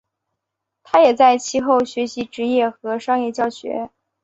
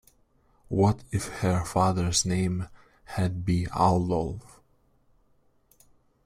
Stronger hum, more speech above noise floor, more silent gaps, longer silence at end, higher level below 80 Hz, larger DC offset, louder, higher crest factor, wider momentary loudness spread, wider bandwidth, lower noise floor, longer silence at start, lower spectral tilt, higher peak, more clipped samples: neither; first, 62 dB vs 39 dB; neither; second, 0.35 s vs 1.85 s; second, -62 dBFS vs -48 dBFS; neither; first, -18 LUFS vs -27 LUFS; about the same, 18 dB vs 20 dB; about the same, 13 LU vs 11 LU; second, 8.2 kHz vs 15 kHz; first, -80 dBFS vs -65 dBFS; first, 0.95 s vs 0.7 s; second, -3.5 dB/octave vs -5.5 dB/octave; first, -2 dBFS vs -8 dBFS; neither